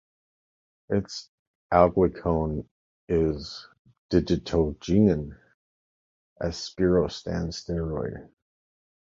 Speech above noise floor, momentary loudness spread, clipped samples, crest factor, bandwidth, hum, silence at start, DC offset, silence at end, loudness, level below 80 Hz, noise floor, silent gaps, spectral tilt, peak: over 65 dB; 14 LU; under 0.1%; 24 dB; 7.6 kHz; none; 0.9 s; under 0.1%; 0.8 s; -26 LUFS; -42 dBFS; under -90 dBFS; 1.28-1.70 s, 2.71-3.08 s, 3.79-3.85 s, 3.98-4.09 s, 5.54-6.36 s; -7 dB/octave; -4 dBFS